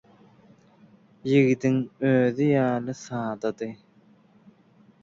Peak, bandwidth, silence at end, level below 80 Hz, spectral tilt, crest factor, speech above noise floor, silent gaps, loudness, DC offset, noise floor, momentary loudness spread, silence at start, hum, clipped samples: -8 dBFS; 7.6 kHz; 1.3 s; -66 dBFS; -7.5 dB/octave; 18 dB; 34 dB; none; -24 LUFS; under 0.1%; -58 dBFS; 13 LU; 1.25 s; none; under 0.1%